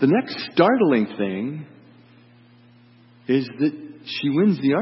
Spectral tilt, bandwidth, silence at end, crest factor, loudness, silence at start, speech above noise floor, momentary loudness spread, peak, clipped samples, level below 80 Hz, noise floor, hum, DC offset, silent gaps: -10.5 dB/octave; 5.8 kHz; 0 s; 20 dB; -21 LUFS; 0 s; 32 dB; 13 LU; -2 dBFS; under 0.1%; -70 dBFS; -52 dBFS; none; under 0.1%; none